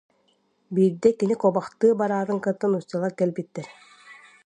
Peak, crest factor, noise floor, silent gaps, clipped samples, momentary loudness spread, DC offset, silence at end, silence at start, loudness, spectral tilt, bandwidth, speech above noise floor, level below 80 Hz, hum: -6 dBFS; 20 dB; -67 dBFS; none; under 0.1%; 12 LU; under 0.1%; 0.35 s; 0.7 s; -23 LUFS; -8 dB/octave; 10 kHz; 44 dB; -70 dBFS; none